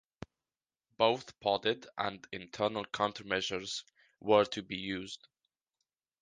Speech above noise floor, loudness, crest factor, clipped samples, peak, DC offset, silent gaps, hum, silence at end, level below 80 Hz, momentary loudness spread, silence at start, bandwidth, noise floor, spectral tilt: over 57 dB; -33 LUFS; 24 dB; under 0.1%; -12 dBFS; under 0.1%; none; none; 1.05 s; -68 dBFS; 17 LU; 1 s; 9.6 kHz; under -90 dBFS; -4 dB/octave